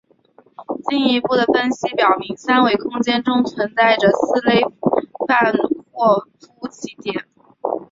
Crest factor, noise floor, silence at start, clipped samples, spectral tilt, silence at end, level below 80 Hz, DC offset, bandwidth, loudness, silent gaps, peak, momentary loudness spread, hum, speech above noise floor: 16 dB; -53 dBFS; 0.6 s; under 0.1%; -5 dB/octave; 0.1 s; -60 dBFS; under 0.1%; 7.8 kHz; -17 LUFS; none; -2 dBFS; 13 LU; none; 36 dB